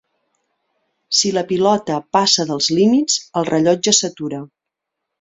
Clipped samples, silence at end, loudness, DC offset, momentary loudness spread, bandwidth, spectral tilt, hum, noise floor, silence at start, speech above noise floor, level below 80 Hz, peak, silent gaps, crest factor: under 0.1%; 0.75 s; -16 LUFS; under 0.1%; 8 LU; 8.2 kHz; -3 dB/octave; none; -81 dBFS; 1.1 s; 64 dB; -60 dBFS; -2 dBFS; none; 18 dB